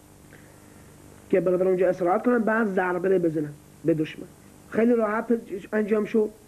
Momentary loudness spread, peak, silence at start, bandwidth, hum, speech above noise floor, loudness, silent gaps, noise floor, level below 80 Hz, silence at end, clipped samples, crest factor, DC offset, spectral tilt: 9 LU; -10 dBFS; 0.3 s; 13.5 kHz; none; 26 dB; -24 LUFS; none; -49 dBFS; -62 dBFS; 0.15 s; under 0.1%; 16 dB; under 0.1%; -7.5 dB/octave